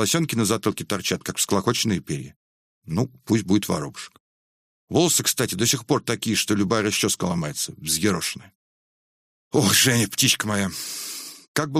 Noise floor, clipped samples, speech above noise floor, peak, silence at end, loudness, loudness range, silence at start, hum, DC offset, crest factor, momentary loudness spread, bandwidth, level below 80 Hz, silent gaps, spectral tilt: under -90 dBFS; under 0.1%; over 67 dB; -4 dBFS; 0 s; -22 LUFS; 3 LU; 0 s; none; under 0.1%; 20 dB; 11 LU; 15.5 kHz; -56 dBFS; 2.36-2.82 s, 4.20-4.88 s, 8.55-9.51 s, 11.48-11.54 s; -3.5 dB/octave